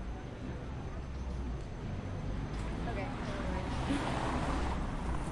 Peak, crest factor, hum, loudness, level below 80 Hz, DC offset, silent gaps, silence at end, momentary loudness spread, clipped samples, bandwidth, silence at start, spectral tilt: -22 dBFS; 14 dB; none; -38 LUFS; -40 dBFS; under 0.1%; none; 0 s; 8 LU; under 0.1%; 11.5 kHz; 0 s; -6.5 dB/octave